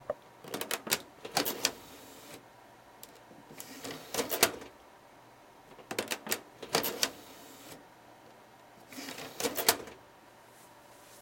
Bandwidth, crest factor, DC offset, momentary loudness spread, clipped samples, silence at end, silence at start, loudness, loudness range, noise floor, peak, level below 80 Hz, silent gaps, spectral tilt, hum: 17 kHz; 32 dB; under 0.1%; 27 LU; under 0.1%; 0 s; 0 s; -33 LUFS; 3 LU; -57 dBFS; -6 dBFS; -70 dBFS; none; -1 dB/octave; none